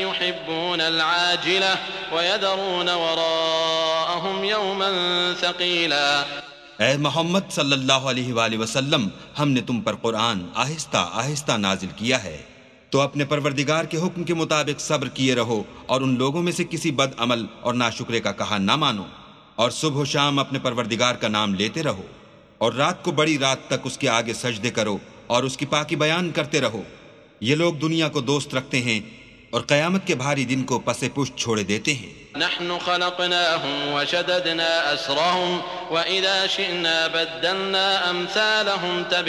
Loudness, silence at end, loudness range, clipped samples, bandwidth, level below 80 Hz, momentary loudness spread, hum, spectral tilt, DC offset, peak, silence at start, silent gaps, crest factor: -22 LUFS; 0 s; 3 LU; under 0.1%; 13.5 kHz; -58 dBFS; 6 LU; none; -3.5 dB/octave; under 0.1%; -2 dBFS; 0 s; none; 22 dB